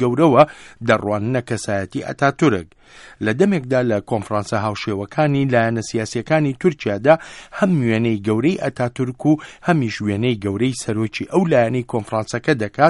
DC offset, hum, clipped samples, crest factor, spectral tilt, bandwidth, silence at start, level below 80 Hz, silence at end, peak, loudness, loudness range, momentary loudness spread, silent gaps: under 0.1%; none; under 0.1%; 18 dB; -6.5 dB/octave; 11.5 kHz; 0 s; -52 dBFS; 0 s; 0 dBFS; -19 LUFS; 2 LU; 7 LU; none